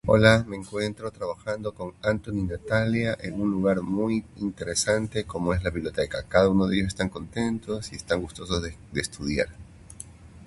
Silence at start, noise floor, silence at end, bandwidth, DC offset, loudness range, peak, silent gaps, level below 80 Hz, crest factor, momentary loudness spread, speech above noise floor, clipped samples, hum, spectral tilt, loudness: 0.05 s; -45 dBFS; 0 s; 11.5 kHz; under 0.1%; 4 LU; -2 dBFS; none; -44 dBFS; 24 dB; 12 LU; 19 dB; under 0.1%; none; -5.5 dB/octave; -27 LUFS